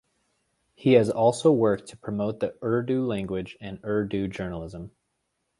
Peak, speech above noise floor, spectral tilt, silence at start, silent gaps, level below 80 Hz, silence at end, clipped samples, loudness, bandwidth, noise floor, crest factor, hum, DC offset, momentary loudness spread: -6 dBFS; 52 dB; -7 dB/octave; 0.8 s; none; -54 dBFS; 0.7 s; under 0.1%; -25 LUFS; 11.5 kHz; -77 dBFS; 20 dB; none; under 0.1%; 16 LU